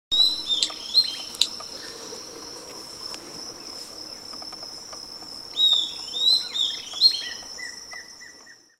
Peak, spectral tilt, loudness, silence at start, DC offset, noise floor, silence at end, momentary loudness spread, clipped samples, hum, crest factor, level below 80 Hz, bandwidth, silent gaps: 0 dBFS; 1 dB/octave; -21 LUFS; 0.1 s; under 0.1%; -49 dBFS; 0.25 s; 19 LU; under 0.1%; none; 28 dB; -64 dBFS; 16 kHz; none